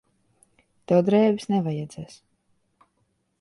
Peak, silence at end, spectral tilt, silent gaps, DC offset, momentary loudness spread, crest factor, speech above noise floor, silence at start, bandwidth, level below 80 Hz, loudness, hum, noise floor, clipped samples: -8 dBFS; 1.35 s; -7.5 dB/octave; none; under 0.1%; 20 LU; 18 dB; 49 dB; 0.9 s; 11.5 kHz; -66 dBFS; -22 LUFS; none; -71 dBFS; under 0.1%